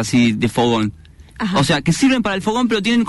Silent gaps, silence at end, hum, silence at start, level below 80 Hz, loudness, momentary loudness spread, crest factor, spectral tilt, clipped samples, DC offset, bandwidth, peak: none; 0 s; none; 0 s; -42 dBFS; -17 LUFS; 5 LU; 12 dB; -5 dB/octave; under 0.1%; under 0.1%; 12 kHz; -6 dBFS